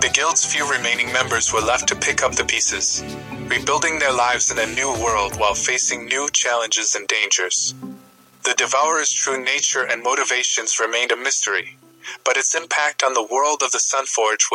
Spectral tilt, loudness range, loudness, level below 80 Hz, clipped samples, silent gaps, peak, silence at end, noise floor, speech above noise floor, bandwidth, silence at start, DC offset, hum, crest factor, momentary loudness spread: 0 dB/octave; 1 LU; -18 LUFS; -48 dBFS; under 0.1%; none; 0 dBFS; 0 s; -47 dBFS; 27 dB; 17 kHz; 0 s; under 0.1%; none; 20 dB; 4 LU